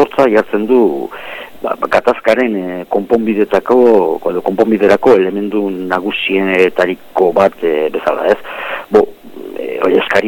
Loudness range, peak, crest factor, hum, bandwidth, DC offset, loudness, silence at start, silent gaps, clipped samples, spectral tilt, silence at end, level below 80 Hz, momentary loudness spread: 2 LU; 0 dBFS; 12 dB; none; 17.5 kHz; under 0.1%; -13 LUFS; 0 s; none; under 0.1%; -6 dB/octave; 0 s; -50 dBFS; 12 LU